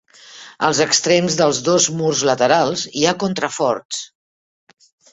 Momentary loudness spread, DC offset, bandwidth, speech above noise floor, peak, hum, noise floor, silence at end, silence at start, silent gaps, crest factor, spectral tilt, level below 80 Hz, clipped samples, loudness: 13 LU; under 0.1%; 8.4 kHz; 24 dB; -2 dBFS; none; -41 dBFS; 1.05 s; 0.3 s; 3.85-3.89 s; 18 dB; -3 dB/octave; -58 dBFS; under 0.1%; -17 LUFS